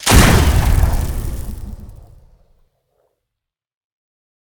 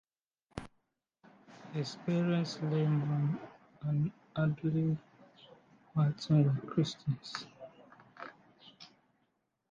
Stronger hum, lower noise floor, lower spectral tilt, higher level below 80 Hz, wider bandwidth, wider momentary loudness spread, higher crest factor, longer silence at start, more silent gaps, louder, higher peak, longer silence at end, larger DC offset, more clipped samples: neither; about the same, -82 dBFS vs -79 dBFS; second, -4.5 dB/octave vs -7.5 dB/octave; first, -20 dBFS vs -68 dBFS; first, over 20 kHz vs 7.4 kHz; first, 23 LU vs 20 LU; about the same, 18 dB vs 18 dB; second, 0 s vs 0.55 s; neither; first, -15 LUFS vs -34 LUFS; first, 0 dBFS vs -18 dBFS; first, 2.55 s vs 0.85 s; neither; neither